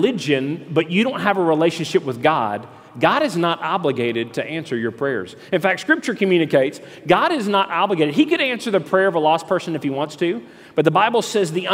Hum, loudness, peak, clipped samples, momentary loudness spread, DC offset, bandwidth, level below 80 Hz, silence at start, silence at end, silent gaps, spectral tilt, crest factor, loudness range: none; -19 LUFS; 0 dBFS; under 0.1%; 8 LU; under 0.1%; 16 kHz; -66 dBFS; 0 s; 0 s; none; -5.5 dB/octave; 18 dB; 3 LU